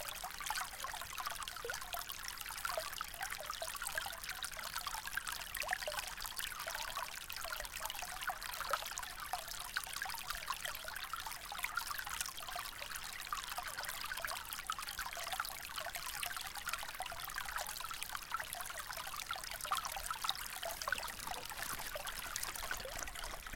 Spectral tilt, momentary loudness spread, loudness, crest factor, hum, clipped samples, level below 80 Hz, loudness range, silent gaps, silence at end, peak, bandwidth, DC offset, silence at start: 0 dB/octave; 4 LU; -42 LUFS; 28 dB; none; under 0.1%; -58 dBFS; 1 LU; none; 0 s; -16 dBFS; 17 kHz; under 0.1%; 0 s